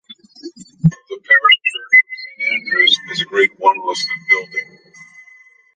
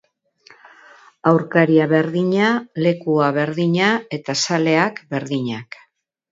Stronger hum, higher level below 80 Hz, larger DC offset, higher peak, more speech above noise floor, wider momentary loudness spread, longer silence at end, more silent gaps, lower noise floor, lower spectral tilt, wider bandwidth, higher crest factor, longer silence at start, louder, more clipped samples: neither; first, -54 dBFS vs -66 dBFS; neither; about the same, -2 dBFS vs 0 dBFS; second, 30 dB vs 35 dB; first, 14 LU vs 9 LU; first, 1.1 s vs 0.7 s; neither; second, -47 dBFS vs -52 dBFS; second, -4 dB/octave vs -5.5 dB/octave; first, 9.6 kHz vs 7.8 kHz; about the same, 16 dB vs 18 dB; second, 0.45 s vs 1.25 s; first, -14 LUFS vs -18 LUFS; neither